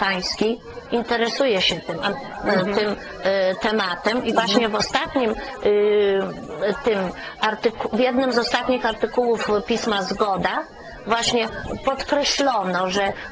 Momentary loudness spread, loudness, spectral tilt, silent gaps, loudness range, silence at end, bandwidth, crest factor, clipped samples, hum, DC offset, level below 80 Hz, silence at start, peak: 7 LU; -21 LUFS; -4 dB/octave; none; 1 LU; 0 s; 8 kHz; 20 dB; under 0.1%; none; under 0.1%; -48 dBFS; 0 s; -2 dBFS